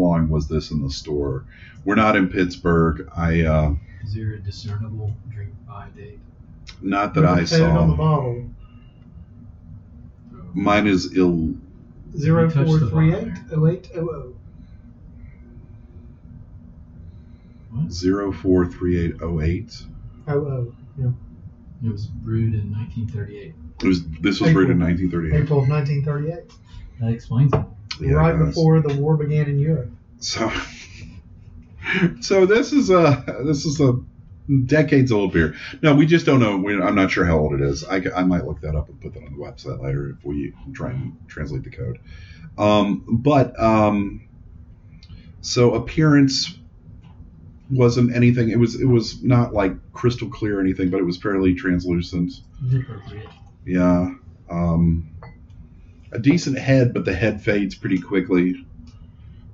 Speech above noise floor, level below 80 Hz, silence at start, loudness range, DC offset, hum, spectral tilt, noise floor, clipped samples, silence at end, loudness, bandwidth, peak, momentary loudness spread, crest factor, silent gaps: 25 dB; -38 dBFS; 0 s; 8 LU; under 0.1%; none; -7 dB/octave; -44 dBFS; under 0.1%; 0 s; -20 LUFS; 7.6 kHz; -4 dBFS; 16 LU; 18 dB; none